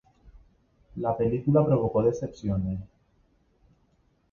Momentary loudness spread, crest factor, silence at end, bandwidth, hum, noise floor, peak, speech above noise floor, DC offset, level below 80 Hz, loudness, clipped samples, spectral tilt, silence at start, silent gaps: 11 LU; 20 dB; 1.45 s; 7 kHz; none; -67 dBFS; -10 dBFS; 42 dB; under 0.1%; -50 dBFS; -26 LUFS; under 0.1%; -10 dB/octave; 0.25 s; none